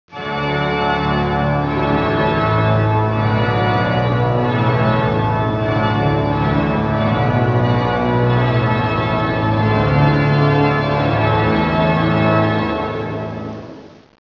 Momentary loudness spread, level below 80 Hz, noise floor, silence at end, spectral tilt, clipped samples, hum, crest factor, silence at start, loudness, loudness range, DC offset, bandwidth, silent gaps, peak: 5 LU; -36 dBFS; -36 dBFS; 0.4 s; -8.5 dB/octave; under 0.1%; none; 14 dB; 0.1 s; -16 LUFS; 2 LU; under 0.1%; 6 kHz; none; -2 dBFS